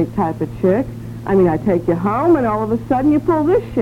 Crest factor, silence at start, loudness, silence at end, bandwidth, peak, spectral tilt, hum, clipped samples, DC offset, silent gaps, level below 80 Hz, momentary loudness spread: 12 dB; 0 s; -16 LUFS; 0 s; 14.5 kHz; -2 dBFS; -9.5 dB/octave; none; under 0.1%; under 0.1%; none; -40 dBFS; 6 LU